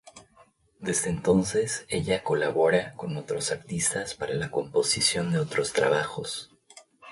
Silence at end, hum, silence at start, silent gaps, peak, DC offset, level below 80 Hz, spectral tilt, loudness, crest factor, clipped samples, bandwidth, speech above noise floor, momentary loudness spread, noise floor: 0 s; none; 0.05 s; none; -8 dBFS; under 0.1%; -56 dBFS; -3.5 dB/octave; -27 LUFS; 20 dB; under 0.1%; 11.5 kHz; 34 dB; 11 LU; -60 dBFS